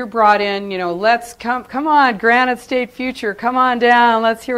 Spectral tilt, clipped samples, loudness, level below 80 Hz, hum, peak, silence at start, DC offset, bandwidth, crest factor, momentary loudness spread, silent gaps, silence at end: -4.5 dB/octave; under 0.1%; -15 LUFS; -54 dBFS; none; 0 dBFS; 0 s; under 0.1%; 15 kHz; 14 dB; 10 LU; none; 0 s